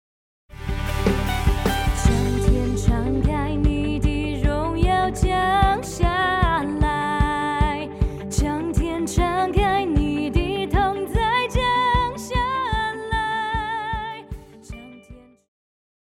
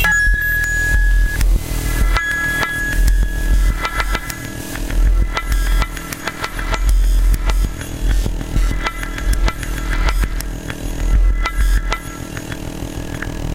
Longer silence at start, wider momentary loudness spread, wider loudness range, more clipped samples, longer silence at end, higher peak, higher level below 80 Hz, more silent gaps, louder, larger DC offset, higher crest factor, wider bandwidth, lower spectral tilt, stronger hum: first, 0.5 s vs 0 s; second, 7 LU vs 10 LU; about the same, 3 LU vs 4 LU; neither; first, 0.85 s vs 0 s; about the same, -4 dBFS vs -2 dBFS; second, -26 dBFS vs -18 dBFS; neither; about the same, -22 LUFS vs -20 LUFS; second, under 0.1% vs 0.3%; about the same, 18 dB vs 14 dB; about the same, 16.5 kHz vs 16.5 kHz; first, -5.5 dB/octave vs -4 dB/octave; neither